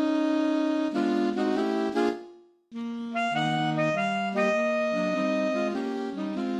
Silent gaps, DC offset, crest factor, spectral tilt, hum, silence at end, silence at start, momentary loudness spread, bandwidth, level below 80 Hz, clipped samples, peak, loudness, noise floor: none; under 0.1%; 12 dB; -6 dB/octave; none; 0 s; 0 s; 7 LU; 11 kHz; -72 dBFS; under 0.1%; -14 dBFS; -27 LUFS; -51 dBFS